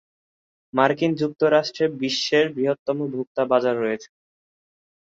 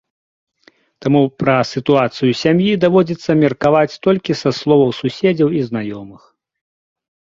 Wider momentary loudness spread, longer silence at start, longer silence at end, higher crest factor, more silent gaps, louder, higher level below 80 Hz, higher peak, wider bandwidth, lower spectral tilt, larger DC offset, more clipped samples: about the same, 7 LU vs 6 LU; second, 0.75 s vs 1 s; second, 1 s vs 1.25 s; about the same, 20 dB vs 16 dB; first, 2.79-2.86 s, 3.27-3.35 s vs none; second, -22 LUFS vs -15 LUFS; second, -68 dBFS vs -54 dBFS; second, -4 dBFS vs 0 dBFS; about the same, 7.8 kHz vs 7.6 kHz; second, -5 dB/octave vs -7 dB/octave; neither; neither